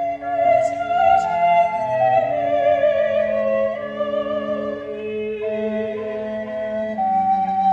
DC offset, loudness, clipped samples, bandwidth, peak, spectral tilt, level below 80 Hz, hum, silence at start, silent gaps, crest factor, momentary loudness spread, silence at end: under 0.1%; -20 LUFS; under 0.1%; 8.2 kHz; -4 dBFS; -6 dB/octave; -56 dBFS; none; 0 s; none; 14 dB; 10 LU; 0 s